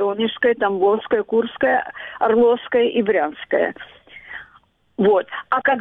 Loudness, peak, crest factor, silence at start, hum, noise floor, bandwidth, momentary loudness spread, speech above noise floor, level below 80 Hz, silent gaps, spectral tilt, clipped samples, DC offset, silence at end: -19 LUFS; -4 dBFS; 16 dB; 0 s; none; -55 dBFS; 3.9 kHz; 19 LU; 36 dB; -60 dBFS; none; -8 dB/octave; under 0.1%; under 0.1%; 0 s